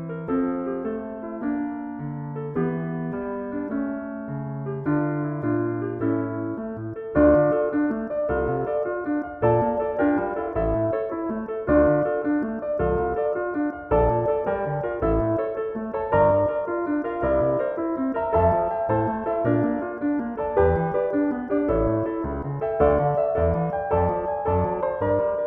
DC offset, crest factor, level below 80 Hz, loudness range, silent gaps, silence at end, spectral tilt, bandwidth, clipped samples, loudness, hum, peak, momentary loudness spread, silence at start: under 0.1%; 18 dB; -40 dBFS; 5 LU; none; 0 s; -12 dB/octave; 3.8 kHz; under 0.1%; -24 LUFS; none; -6 dBFS; 9 LU; 0 s